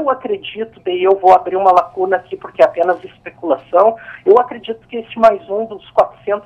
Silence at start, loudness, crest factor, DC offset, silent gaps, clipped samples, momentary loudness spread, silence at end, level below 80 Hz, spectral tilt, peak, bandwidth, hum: 0 s; -15 LUFS; 14 dB; under 0.1%; none; under 0.1%; 15 LU; 0.05 s; -56 dBFS; -6 dB/octave; 0 dBFS; 7.6 kHz; none